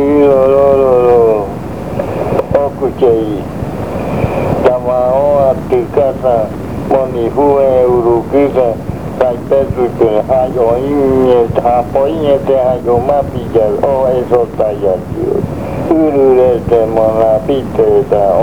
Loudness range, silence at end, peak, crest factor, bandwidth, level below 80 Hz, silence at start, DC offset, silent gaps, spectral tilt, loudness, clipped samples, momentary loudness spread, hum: 2 LU; 0 s; 0 dBFS; 10 dB; 19.5 kHz; -32 dBFS; 0 s; 2%; none; -8.5 dB/octave; -11 LUFS; 0.2%; 9 LU; none